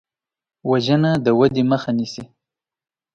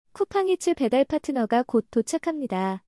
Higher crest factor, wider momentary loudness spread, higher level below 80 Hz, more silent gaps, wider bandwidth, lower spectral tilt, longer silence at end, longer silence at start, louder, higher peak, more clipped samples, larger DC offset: about the same, 18 dB vs 14 dB; first, 13 LU vs 5 LU; first, -54 dBFS vs -60 dBFS; neither; second, 9 kHz vs 12 kHz; first, -7 dB/octave vs -5 dB/octave; first, 0.9 s vs 0.1 s; first, 0.65 s vs 0.15 s; first, -18 LUFS vs -25 LUFS; first, -2 dBFS vs -10 dBFS; neither; neither